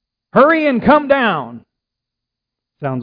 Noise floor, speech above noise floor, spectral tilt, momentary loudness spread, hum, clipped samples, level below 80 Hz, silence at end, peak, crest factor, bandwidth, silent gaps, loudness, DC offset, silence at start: -82 dBFS; 69 dB; -9 dB/octave; 14 LU; none; under 0.1%; -48 dBFS; 0 s; 0 dBFS; 16 dB; 5.2 kHz; none; -13 LUFS; under 0.1%; 0.35 s